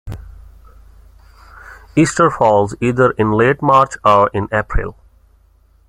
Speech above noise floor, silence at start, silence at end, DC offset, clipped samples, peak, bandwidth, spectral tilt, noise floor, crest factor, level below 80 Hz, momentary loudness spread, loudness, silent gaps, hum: 38 dB; 0.05 s; 0.95 s; under 0.1%; under 0.1%; 0 dBFS; 11.5 kHz; -6 dB/octave; -51 dBFS; 16 dB; -34 dBFS; 12 LU; -14 LUFS; none; none